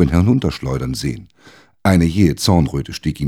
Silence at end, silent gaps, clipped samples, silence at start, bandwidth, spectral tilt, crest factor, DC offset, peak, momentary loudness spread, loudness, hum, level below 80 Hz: 0 s; none; under 0.1%; 0 s; 16.5 kHz; -6.5 dB/octave; 16 dB; under 0.1%; 0 dBFS; 10 LU; -17 LUFS; none; -32 dBFS